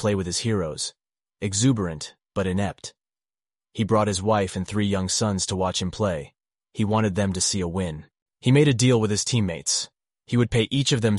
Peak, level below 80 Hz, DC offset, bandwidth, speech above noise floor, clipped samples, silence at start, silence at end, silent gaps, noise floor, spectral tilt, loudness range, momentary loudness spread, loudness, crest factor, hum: -6 dBFS; -50 dBFS; under 0.1%; 11.5 kHz; over 67 dB; under 0.1%; 0 s; 0 s; 8.22-8.26 s; under -90 dBFS; -4.5 dB/octave; 4 LU; 12 LU; -24 LUFS; 18 dB; none